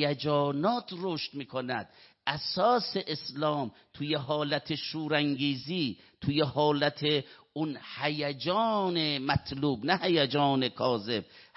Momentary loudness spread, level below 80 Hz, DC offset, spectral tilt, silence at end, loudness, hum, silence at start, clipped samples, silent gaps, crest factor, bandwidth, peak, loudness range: 9 LU; -62 dBFS; under 0.1%; -8.5 dB/octave; 0.15 s; -30 LUFS; none; 0 s; under 0.1%; none; 20 dB; 6 kHz; -10 dBFS; 3 LU